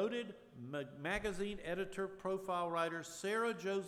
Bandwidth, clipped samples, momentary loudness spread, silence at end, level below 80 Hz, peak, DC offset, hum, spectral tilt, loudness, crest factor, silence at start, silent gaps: 15.5 kHz; under 0.1%; 8 LU; 0 s; -62 dBFS; -24 dBFS; under 0.1%; none; -4.5 dB/octave; -41 LUFS; 16 dB; 0 s; none